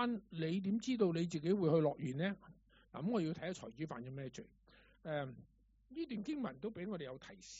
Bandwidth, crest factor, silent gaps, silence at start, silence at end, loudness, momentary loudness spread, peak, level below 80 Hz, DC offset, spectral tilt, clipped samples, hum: 7.6 kHz; 18 dB; none; 0 s; 0 s; -40 LUFS; 16 LU; -22 dBFS; -72 dBFS; under 0.1%; -6.5 dB/octave; under 0.1%; none